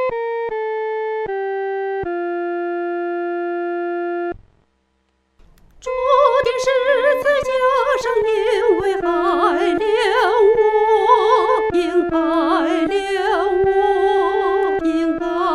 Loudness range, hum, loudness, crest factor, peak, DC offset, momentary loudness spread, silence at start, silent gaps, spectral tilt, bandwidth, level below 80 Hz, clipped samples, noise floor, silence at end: 8 LU; none; -18 LUFS; 16 dB; -2 dBFS; under 0.1%; 9 LU; 0 s; none; -4.5 dB/octave; 12.5 kHz; -46 dBFS; under 0.1%; -65 dBFS; 0 s